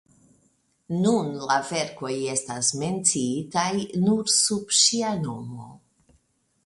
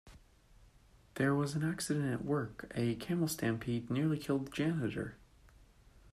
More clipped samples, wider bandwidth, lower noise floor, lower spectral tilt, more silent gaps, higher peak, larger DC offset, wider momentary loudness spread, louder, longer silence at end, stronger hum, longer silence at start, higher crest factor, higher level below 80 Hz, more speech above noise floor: neither; second, 11.5 kHz vs 14.5 kHz; first, -67 dBFS vs -63 dBFS; second, -3 dB/octave vs -6 dB/octave; neither; first, -4 dBFS vs -20 dBFS; neither; first, 11 LU vs 5 LU; first, -23 LUFS vs -36 LUFS; first, 0.9 s vs 0.05 s; neither; first, 0.9 s vs 0.05 s; about the same, 20 dB vs 16 dB; about the same, -64 dBFS vs -62 dBFS; first, 42 dB vs 29 dB